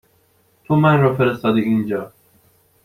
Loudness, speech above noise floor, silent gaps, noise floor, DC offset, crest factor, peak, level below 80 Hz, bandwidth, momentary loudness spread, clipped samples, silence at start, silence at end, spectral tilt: -17 LUFS; 43 dB; none; -59 dBFS; under 0.1%; 16 dB; -2 dBFS; -54 dBFS; 13 kHz; 11 LU; under 0.1%; 0.7 s; 0.75 s; -9 dB/octave